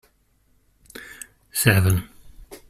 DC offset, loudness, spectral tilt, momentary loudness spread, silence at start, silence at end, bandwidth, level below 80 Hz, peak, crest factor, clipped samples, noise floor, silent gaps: under 0.1%; -20 LUFS; -4.5 dB/octave; 25 LU; 0.95 s; 0.15 s; 16 kHz; -46 dBFS; -2 dBFS; 22 dB; under 0.1%; -63 dBFS; none